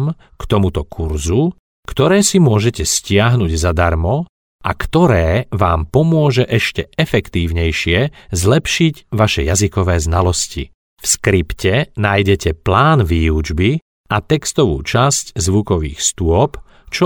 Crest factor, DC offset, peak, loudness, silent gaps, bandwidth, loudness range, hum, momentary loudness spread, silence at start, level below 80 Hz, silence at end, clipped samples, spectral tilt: 14 dB; under 0.1%; 0 dBFS; -15 LUFS; 1.59-1.83 s, 4.29-4.59 s, 10.74-10.97 s, 13.82-14.04 s; 18.5 kHz; 1 LU; none; 9 LU; 0 s; -28 dBFS; 0 s; under 0.1%; -5 dB/octave